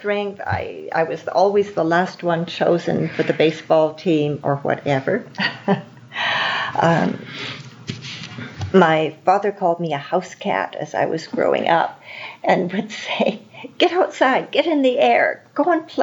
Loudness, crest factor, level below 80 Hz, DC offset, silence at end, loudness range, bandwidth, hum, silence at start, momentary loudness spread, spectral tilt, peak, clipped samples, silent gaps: -19 LUFS; 18 dB; -64 dBFS; under 0.1%; 0 s; 3 LU; 7.8 kHz; none; 0 s; 13 LU; -6 dB/octave; -2 dBFS; under 0.1%; none